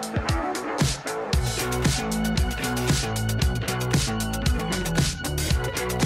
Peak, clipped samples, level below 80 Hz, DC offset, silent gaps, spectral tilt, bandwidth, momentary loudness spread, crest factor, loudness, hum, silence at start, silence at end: -10 dBFS; under 0.1%; -32 dBFS; under 0.1%; none; -4.5 dB/octave; 16 kHz; 3 LU; 14 dB; -25 LUFS; none; 0 s; 0 s